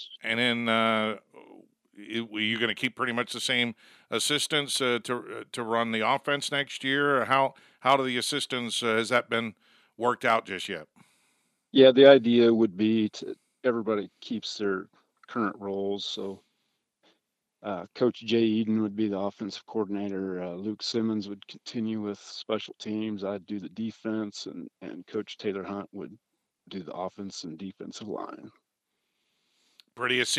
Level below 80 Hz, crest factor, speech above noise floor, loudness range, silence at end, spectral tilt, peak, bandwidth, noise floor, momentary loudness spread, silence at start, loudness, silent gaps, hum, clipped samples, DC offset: -80 dBFS; 24 dB; 54 dB; 15 LU; 0 s; -4 dB/octave; -4 dBFS; 14.5 kHz; -81 dBFS; 15 LU; 0 s; -27 LUFS; none; none; under 0.1%; under 0.1%